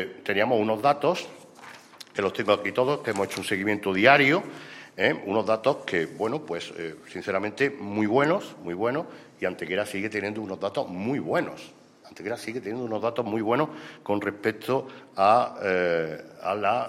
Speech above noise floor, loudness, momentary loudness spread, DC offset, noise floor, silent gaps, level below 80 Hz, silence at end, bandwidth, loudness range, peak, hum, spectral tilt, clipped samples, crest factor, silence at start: 21 dB; -26 LUFS; 14 LU; under 0.1%; -47 dBFS; none; -70 dBFS; 0 s; 15.5 kHz; 7 LU; -2 dBFS; none; -5.5 dB/octave; under 0.1%; 24 dB; 0 s